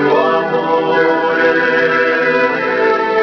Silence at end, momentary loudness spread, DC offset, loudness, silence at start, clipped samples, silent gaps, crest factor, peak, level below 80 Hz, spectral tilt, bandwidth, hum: 0 s; 2 LU; under 0.1%; -13 LUFS; 0 s; under 0.1%; none; 12 dB; -2 dBFS; -56 dBFS; -6 dB/octave; 5.4 kHz; none